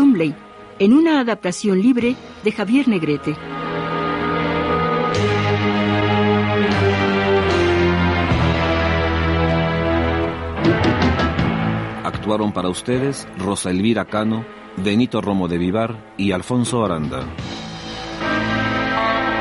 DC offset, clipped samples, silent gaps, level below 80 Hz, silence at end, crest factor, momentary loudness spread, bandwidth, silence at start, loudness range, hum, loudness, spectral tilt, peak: under 0.1%; under 0.1%; none; -36 dBFS; 0 s; 14 dB; 8 LU; 11.5 kHz; 0 s; 4 LU; none; -19 LUFS; -6 dB/octave; -4 dBFS